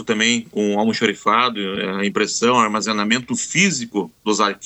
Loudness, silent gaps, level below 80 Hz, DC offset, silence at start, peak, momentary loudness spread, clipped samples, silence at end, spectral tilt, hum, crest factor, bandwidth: -18 LUFS; none; -62 dBFS; under 0.1%; 0 s; 0 dBFS; 7 LU; under 0.1%; 0 s; -3 dB/octave; none; 18 dB; 8.6 kHz